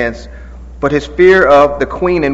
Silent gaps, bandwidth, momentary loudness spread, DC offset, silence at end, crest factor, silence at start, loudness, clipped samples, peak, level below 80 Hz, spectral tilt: none; 7.8 kHz; 13 LU; under 0.1%; 0 s; 12 dB; 0 s; -10 LUFS; 0.5%; 0 dBFS; -30 dBFS; -6.5 dB/octave